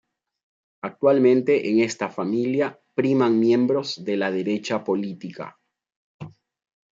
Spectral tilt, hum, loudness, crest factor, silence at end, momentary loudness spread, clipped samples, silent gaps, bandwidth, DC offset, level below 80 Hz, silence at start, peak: -6 dB/octave; none; -22 LUFS; 18 dB; 0.65 s; 19 LU; under 0.1%; 5.96-6.19 s; 7.8 kHz; under 0.1%; -72 dBFS; 0.85 s; -6 dBFS